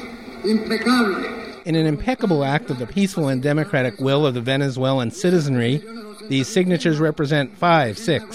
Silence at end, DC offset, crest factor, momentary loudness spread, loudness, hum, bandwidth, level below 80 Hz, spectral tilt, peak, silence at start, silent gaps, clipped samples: 0 s; 0.3%; 16 dB; 8 LU; -20 LUFS; none; 14.5 kHz; -48 dBFS; -6 dB/octave; -4 dBFS; 0 s; none; under 0.1%